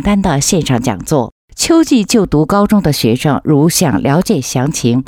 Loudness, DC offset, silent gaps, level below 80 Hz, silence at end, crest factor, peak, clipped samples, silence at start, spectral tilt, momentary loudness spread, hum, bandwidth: -12 LUFS; under 0.1%; 1.32-1.48 s; -34 dBFS; 0.05 s; 12 dB; 0 dBFS; under 0.1%; 0 s; -5 dB/octave; 5 LU; none; 17 kHz